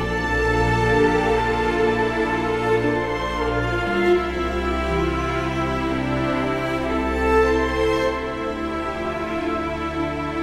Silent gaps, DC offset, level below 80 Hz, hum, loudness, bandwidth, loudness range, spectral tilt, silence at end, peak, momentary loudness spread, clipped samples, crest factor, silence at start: none; under 0.1%; -32 dBFS; none; -21 LUFS; 13.5 kHz; 2 LU; -6 dB/octave; 0 s; -6 dBFS; 7 LU; under 0.1%; 16 dB; 0 s